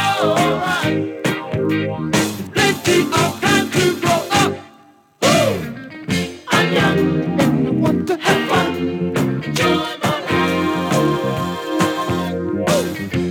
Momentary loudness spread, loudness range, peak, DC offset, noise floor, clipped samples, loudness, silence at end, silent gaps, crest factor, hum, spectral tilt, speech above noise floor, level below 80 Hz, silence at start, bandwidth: 7 LU; 2 LU; -2 dBFS; under 0.1%; -49 dBFS; under 0.1%; -18 LUFS; 0 s; none; 16 dB; none; -4.5 dB/octave; 31 dB; -48 dBFS; 0 s; 19 kHz